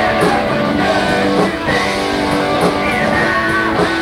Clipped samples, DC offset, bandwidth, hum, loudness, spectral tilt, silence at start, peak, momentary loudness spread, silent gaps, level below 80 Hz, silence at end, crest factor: under 0.1%; under 0.1%; 16.5 kHz; none; -14 LUFS; -5 dB/octave; 0 s; -2 dBFS; 2 LU; none; -36 dBFS; 0 s; 14 dB